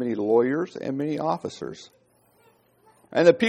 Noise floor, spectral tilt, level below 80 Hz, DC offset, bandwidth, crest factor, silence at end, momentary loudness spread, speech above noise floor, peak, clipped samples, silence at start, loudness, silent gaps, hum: -61 dBFS; -6 dB/octave; -68 dBFS; under 0.1%; 9.2 kHz; 22 dB; 0 s; 17 LU; 38 dB; -2 dBFS; under 0.1%; 0 s; -24 LUFS; none; 60 Hz at -65 dBFS